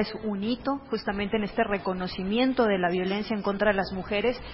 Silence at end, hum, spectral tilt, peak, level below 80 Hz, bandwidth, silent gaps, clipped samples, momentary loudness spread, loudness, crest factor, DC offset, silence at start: 0 s; none; -10 dB/octave; -8 dBFS; -50 dBFS; 5.8 kHz; none; under 0.1%; 6 LU; -27 LUFS; 18 dB; under 0.1%; 0 s